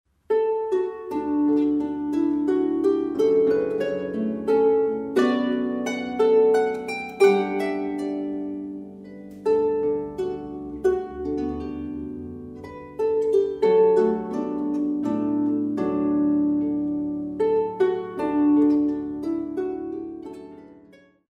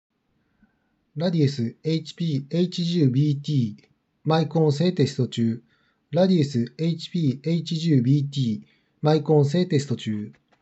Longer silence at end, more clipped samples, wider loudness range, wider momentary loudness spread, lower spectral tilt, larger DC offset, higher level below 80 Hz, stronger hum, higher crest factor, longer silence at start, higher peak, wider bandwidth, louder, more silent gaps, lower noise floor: first, 0.6 s vs 0.3 s; neither; first, 5 LU vs 2 LU; first, 14 LU vs 8 LU; about the same, -7 dB/octave vs -7.5 dB/octave; neither; first, -54 dBFS vs -76 dBFS; neither; about the same, 16 dB vs 16 dB; second, 0.3 s vs 1.15 s; about the same, -6 dBFS vs -8 dBFS; first, 10.5 kHz vs 8.2 kHz; about the same, -23 LUFS vs -23 LUFS; neither; second, -53 dBFS vs -70 dBFS